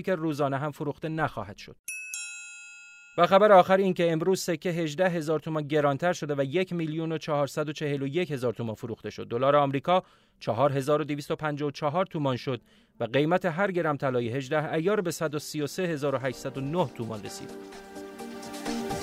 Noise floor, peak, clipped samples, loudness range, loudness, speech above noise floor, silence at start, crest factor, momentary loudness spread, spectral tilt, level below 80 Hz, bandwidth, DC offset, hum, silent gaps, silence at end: -49 dBFS; -6 dBFS; under 0.1%; 7 LU; -28 LUFS; 22 dB; 0 s; 22 dB; 15 LU; -5.5 dB/octave; -64 dBFS; 16 kHz; under 0.1%; none; 1.79-1.84 s; 0 s